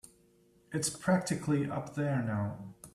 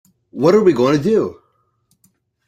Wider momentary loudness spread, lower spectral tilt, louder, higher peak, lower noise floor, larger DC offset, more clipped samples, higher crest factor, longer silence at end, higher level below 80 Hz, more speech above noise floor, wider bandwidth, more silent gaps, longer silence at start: second, 9 LU vs 12 LU; second, -5.5 dB/octave vs -7 dB/octave; second, -33 LUFS vs -15 LUFS; second, -16 dBFS vs -2 dBFS; about the same, -66 dBFS vs -63 dBFS; neither; neither; about the same, 18 dB vs 16 dB; second, 0.05 s vs 1.15 s; second, -66 dBFS vs -56 dBFS; second, 33 dB vs 50 dB; first, 14 kHz vs 12 kHz; neither; first, 0.7 s vs 0.35 s